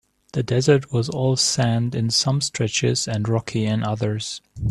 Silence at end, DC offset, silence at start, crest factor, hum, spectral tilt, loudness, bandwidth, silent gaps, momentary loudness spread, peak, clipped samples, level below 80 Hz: 0 s; under 0.1%; 0.35 s; 18 dB; none; -4.5 dB/octave; -21 LUFS; 12.5 kHz; none; 9 LU; -4 dBFS; under 0.1%; -48 dBFS